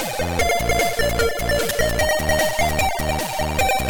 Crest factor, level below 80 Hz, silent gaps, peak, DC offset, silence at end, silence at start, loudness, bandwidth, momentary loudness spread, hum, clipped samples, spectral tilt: 14 dB; -30 dBFS; none; -6 dBFS; under 0.1%; 0 s; 0 s; -20 LUFS; 19.5 kHz; 4 LU; none; under 0.1%; -3.5 dB/octave